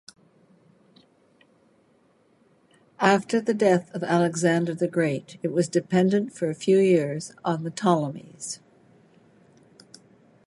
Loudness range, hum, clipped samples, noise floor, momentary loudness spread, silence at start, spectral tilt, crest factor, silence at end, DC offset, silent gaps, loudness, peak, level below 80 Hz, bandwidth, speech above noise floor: 7 LU; none; under 0.1%; -62 dBFS; 11 LU; 3 s; -6 dB/octave; 22 dB; 1.9 s; under 0.1%; none; -24 LUFS; -4 dBFS; -72 dBFS; 11.5 kHz; 39 dB